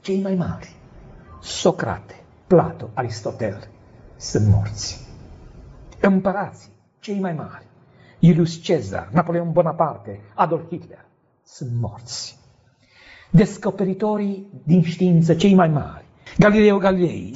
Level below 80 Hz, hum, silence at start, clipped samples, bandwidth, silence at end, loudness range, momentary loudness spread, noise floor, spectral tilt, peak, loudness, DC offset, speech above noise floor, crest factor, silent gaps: -46 dBFS; none; 0.05 s; under 0.1%; 8 kHz; 0 s; 7 LU; 18 LU; -56 dBFS; -7 dB/octave; -2 dBFS; -20 LUFS; under 0.1%; 36 dB; 18 dB; none